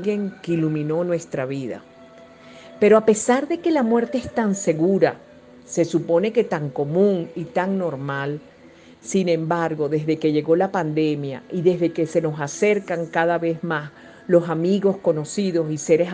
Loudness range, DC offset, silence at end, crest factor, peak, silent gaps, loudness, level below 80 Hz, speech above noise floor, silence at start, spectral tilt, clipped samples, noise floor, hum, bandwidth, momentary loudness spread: 3 LU; under 0.1%; 0 s; 18 dB; -4 dBFS; none; -21 LUFS; -64 dBFS; 27 dB; 0 s; -6 dB/octave; under 0.1%; -47 dBFS; none; 9.8 kHz; 8 LU